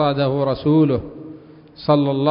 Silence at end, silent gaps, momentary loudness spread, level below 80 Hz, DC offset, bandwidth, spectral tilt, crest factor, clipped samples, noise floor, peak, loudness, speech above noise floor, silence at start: 0 s; none; 20 LU; -48 dBFS; under 0.1%; 5.4 kHz; -12.5 dB/octave; 16 dB; under 0.1%; -40 dBFS; -2 dBFS; -18 LUFS; 23 dB; 0 s